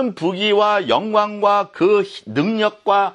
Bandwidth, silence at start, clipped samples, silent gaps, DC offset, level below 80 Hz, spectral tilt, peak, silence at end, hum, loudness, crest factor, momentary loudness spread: 9.6 kHz; 0 s; under 0.1%; none; under 0.1%; -64 dBFS; -5.5 dB/octave; -2 dBFS; 0 s; none; -17 LUFS; 16 dB; 5 LU